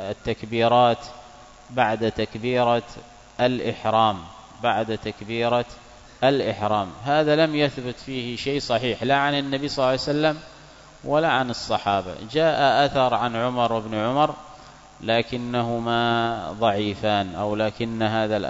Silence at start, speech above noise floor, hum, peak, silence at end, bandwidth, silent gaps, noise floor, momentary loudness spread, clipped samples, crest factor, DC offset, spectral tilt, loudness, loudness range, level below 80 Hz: 0 s; 24 dB; none; -4 dBFS; 0 s; 8 kHz; none; -47 dBFS; 10 LU; under 0.1%; 20 dB; under 0.1%; -5.5 dB/octave; -23 LUFS; 2 LU; -52 dBFS